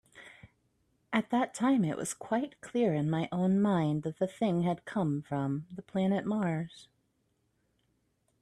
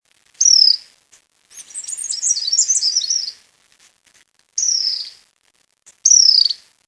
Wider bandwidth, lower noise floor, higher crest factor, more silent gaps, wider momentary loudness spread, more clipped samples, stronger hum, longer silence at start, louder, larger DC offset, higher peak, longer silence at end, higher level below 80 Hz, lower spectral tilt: first, 12.5 kHz vs 11 kHz; first, -76 dBFS vs -62 dBFS; about the same, 18 dB vs 18 dB; neither; second, 8 LU vs 18 LU; neither; neither; second, 0.15 s vs 0.4 s; second, -31 LUFS vs -13 LUFS; neither; second, -14 dBFS vs 0 dBFS; first, 1.6 s vs 0.3 s; first, -70 dBFS vs -76 dBFS; first, -6.5 dB/octave vs 6.5 dB/octave